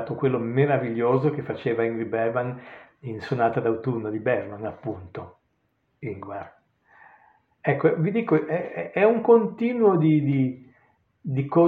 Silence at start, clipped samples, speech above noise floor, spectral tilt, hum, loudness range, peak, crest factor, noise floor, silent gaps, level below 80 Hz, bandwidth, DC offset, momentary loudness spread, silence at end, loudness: 0 s; under 0.1%; 48 dB; -10.5 dB/octave; none; 11 LU; -6 dBFS; 18 dB; -71 dBFS; none; -68 dBFS; 4.9 kHz; under 0.1%; 17 LU; 0 s; -24 LUFS